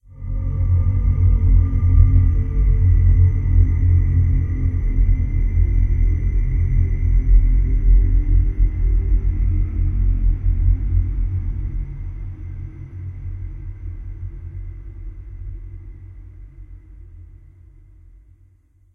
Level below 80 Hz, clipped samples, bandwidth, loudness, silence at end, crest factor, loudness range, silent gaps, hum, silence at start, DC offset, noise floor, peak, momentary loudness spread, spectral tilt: -20 dBFS; under 0.1%; 2.4 kHz; -19 LUFS; 1.7 s; 16 dB; 19 LU; none; none; 0.15 s; under 0.1%; -54 dBFS; -2 dBFS; 18 LU; -11 dB/octave